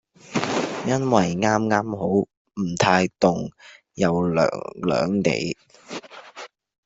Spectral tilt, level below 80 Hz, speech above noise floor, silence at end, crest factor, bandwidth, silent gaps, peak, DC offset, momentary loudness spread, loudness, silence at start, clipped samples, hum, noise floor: -5.5 dB/octave; -58 dBFS; 21 dB; 0.4 s; 20 dB; 8 kHz; 2.37-2.45 s; -2 dBFS; under 0.1%; 18 LU; -22 LUFS; 0.3 s; under 0.1%; none; -43 dBFS